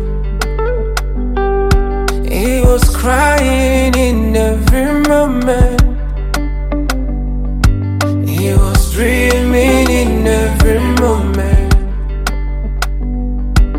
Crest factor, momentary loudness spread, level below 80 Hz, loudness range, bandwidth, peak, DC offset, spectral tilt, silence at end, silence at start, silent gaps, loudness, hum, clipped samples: 12 dB; 8 LU; -14 dBFS; 3 LU; 16.5 kHz; 0 dBFS; under 0.1%; -6 dB/octave; 0 s; 0 s; none; -14 LUFS; none; under 0.1%